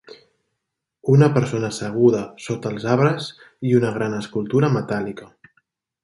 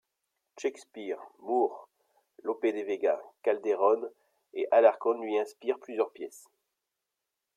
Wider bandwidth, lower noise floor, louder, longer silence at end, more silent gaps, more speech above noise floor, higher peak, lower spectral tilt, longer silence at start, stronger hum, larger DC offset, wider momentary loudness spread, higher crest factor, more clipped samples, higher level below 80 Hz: second, 11.5 kHz vs 13.5 kHz; second, -80 dBFS vs -86 dBFS; first, -20 LUFS vs -30 LUFS; second, 0.8 s vs 1.15 s; neither; first, 61 dB vs 57 dB; first, -2 dBFS vs -10 dBFS; first, -7 dB/octave vs -4 dB/octave; second, 0.1 s vs 0.55 s; neither; neither; second, 13 LU vs 17 LU; about the same, 18 dB vs 22 dB; neither; first, -58 dBFS vs -86 dBFS